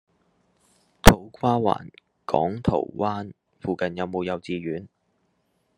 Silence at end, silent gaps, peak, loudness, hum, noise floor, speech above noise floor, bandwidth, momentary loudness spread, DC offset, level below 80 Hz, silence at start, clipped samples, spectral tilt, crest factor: 0.9 s; none; 0 dBFS; -24 LUFS; none; -70 dBFS; 44 dB; 12.5 kHz; 17 LU; under 0.1%; -34 dBFS; 1.05 s; under 0.1%; -5 dB/octave; 24 dB